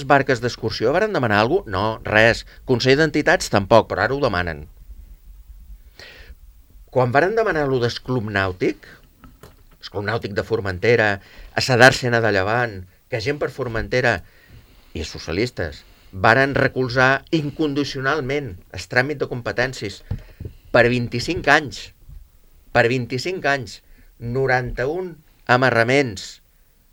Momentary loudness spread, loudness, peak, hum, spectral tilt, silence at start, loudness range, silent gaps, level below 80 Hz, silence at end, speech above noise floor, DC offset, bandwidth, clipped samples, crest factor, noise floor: 16 LU; -19 LUFS; 0 dBFS; none; -5 dB/octave; 0 s; 6 LU; none; -44 dBFS; 0.6 s; 35 dB; under 0.1%; 17 kHz; under 0.1%; 20 dB; -55 dBFS